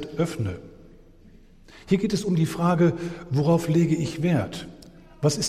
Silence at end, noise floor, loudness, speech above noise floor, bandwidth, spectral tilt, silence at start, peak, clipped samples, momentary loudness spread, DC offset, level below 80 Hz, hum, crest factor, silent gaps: 0 s; -50 dBFS; -24 LUFS; 27 dB; 14 kHz; -6.5 dB/octave; 0 s; -8 dBFS; under 0.1%; 12 LU; under 0.1%; -52 dBFS; none; 16 dB; none